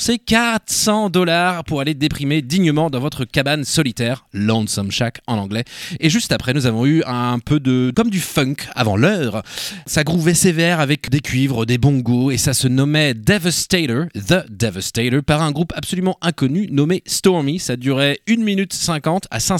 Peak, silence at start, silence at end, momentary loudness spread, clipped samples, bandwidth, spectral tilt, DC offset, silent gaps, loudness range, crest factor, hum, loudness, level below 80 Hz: 0 dBFS; 0 s; 0 s; 6 LU; under 0.1%; 17 kHz; -4.5 dB/octave; under 0.1%; none; 2 LU; 16 dB; none; -17 LUFS; -42 dBFS